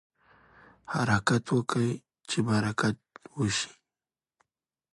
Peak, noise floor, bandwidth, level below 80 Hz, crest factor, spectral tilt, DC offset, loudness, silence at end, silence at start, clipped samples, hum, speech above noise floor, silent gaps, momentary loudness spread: -10 dBFS; under -90 dBFS; 11.5 kHz; -58 dBFS; 20 dB; -5 dB/octave; under 0.1%; -29 LUFS; 1.2 s; 0.9 s; under 0.1%; none; over 63 dB; none; 12 LU